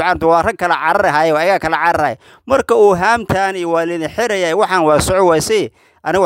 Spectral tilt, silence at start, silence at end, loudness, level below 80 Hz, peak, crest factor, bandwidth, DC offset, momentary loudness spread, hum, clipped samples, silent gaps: -4.5 dB/octave; 0 s; 0 s; -14 LUFS; -42 dBFS; 0 dBFS; 14 dB; 16 kHz; under 0.1%; 7 LU; none; under 0.1%; none